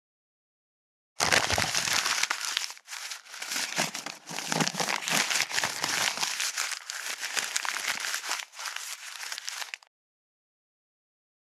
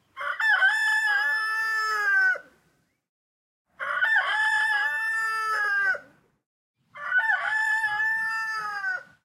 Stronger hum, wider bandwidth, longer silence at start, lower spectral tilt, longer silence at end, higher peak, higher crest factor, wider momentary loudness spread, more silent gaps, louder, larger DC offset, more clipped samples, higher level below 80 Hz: neither; about the same, 18 kHz vs 16.5 kHz; first, 1.2 s vs 0.15 s; first, -0.5 dB/octave vs 1 dB/octave; first, 1.65 s vs 0.2 s; first, -2 dBFS vs -12 dBFS; first, 30 dB vs 14 dB; first, 12 LU vs 9 LU; second, none vs 3.09-3.65 s, 6.46-6.74 s; second, -29 LUFS vs -24 LUFS; neither; neither; first, -64 dBFS vs -78 dBFS